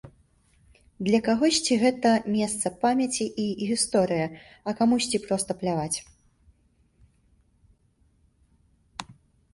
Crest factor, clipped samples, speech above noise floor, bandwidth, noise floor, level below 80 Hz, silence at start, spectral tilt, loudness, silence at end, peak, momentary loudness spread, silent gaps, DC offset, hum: 18 dB; under 0.1%; 40 dB; 11.5 kHz; -65 dBFS; -60 dBFS; 0.05 s; -4 dB/octave; -25 LUFS; 0.4 s; -8 dBFS; 12 LU; none; under 0.1%; none